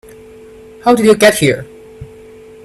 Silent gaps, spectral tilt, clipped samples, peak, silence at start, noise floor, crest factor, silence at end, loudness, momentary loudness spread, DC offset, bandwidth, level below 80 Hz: none; -4.5 dB/octave; under 0.1%; 0 dBFS; 0.85 s; -37 dBFS; 14 dB; 0.6 s; -11 LUFS; 10 LU; under 0.1%; 14.5 kHz; -46 dBFS